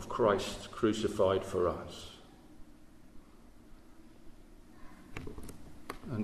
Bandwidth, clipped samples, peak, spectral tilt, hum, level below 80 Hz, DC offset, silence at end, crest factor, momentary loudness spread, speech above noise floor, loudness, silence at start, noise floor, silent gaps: 13.5 kHz; under 0.1%; -16 dBFS; -5.5 dB/octave; none; -56 dBFS; under 0.1%; 0 s; 20 dB; 22 LU; 24 dB; -33 LUFS; 0 s; -55 dBFS; none